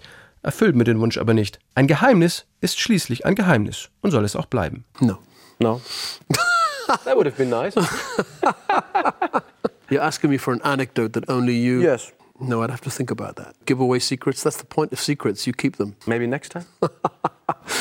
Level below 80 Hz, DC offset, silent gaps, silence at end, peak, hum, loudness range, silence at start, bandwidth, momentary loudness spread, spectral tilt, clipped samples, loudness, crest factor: -56 dBFS; under 0.1%; none; 0 s; -4 dBFS; none; 4 LU; 0.45 s; 16.5 kHz; 10 LU; -5.5 dB/octave; under 0.1%; -21 LUFS; 18 dB